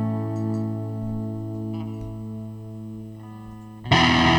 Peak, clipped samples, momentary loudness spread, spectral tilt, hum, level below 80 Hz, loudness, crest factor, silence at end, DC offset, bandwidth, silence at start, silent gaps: -4 dBFS; under 0.1%; 21 LU; -5.5 dB/octave; none; -44 dBFS; -25 LUFS; 22 dB; 0 s; under 0.1%; 9.8 kHz; 0 s; none